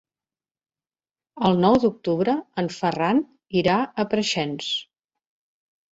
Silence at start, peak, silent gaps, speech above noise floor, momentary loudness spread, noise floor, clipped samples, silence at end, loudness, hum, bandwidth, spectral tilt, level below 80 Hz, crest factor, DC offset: 1.35 s; -4 dBFS; none; over 68 dB; 8 LU; under -90 dBFS; under 0.1%; 1.15 s; -23 LUFS; none; 8 kHz; -5.5 dB/octave; -58 dBFS; 20 dB; under 0.1%